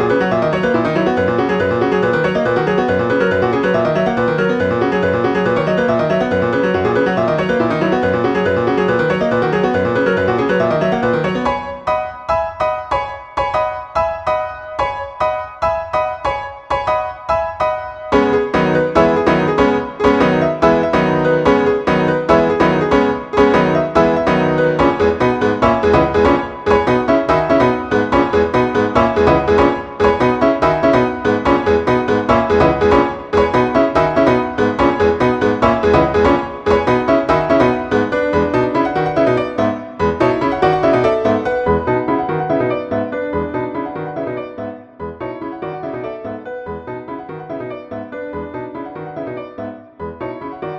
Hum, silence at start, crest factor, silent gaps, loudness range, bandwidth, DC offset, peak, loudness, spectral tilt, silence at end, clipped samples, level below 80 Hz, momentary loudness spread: none; 0 s; 16 dB; none; 10 LU; 9 kHz; under 0.1%; 0 dBFS; -15 LUFS; -7 dB/octave; 0 s; under 0.1%; -38 dBFS; 13 LU